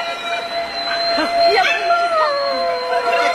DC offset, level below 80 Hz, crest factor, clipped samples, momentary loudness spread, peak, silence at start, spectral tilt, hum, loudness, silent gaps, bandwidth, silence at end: under 0.1%; -54 dBFS; 14 dB; under 0.1%; 8 LU; -4 dBFS; 0 s; -2 dB/octave; none; -17 LUFS; none; 13.5 kHz; 0 s